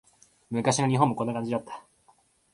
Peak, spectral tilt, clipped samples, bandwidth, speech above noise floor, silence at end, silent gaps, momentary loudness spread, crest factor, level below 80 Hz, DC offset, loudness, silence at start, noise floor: -6 dBFS; -5.5 dB/octave; under 0.1%; 11.5 kHz; 38 dB; 0.75 s; none; 15 LU; 22 dB; -66 dBFS; under 0.1%; -27 LUFS; 0.5 s; -64 dBFS